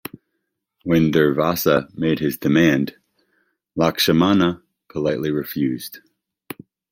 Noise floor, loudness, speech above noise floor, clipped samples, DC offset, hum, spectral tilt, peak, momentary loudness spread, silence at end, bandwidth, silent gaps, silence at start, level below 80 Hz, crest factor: -76 dBFS; -19 LUFS; 58 dB; under 0.1%; under 0.1%; none; -5.5 dB/octave; -2 dBFS; 20 LU; 0.95 s; 16.5 kHz; none; 0.85 s; -54 dBFS; 18 dB